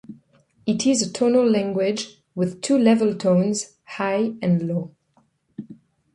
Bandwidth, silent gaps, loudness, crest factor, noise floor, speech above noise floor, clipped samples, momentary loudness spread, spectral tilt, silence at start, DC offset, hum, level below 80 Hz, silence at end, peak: 11.5 kHz; none; -21 LUFS; 18 dB; -64 dBFS; 43 dB; under 0.1%; 17 LU; -5.5 dB/octave; 0.1 s; under 0.1%; none; -64 dBFS; 0.4 s; -4 dBFS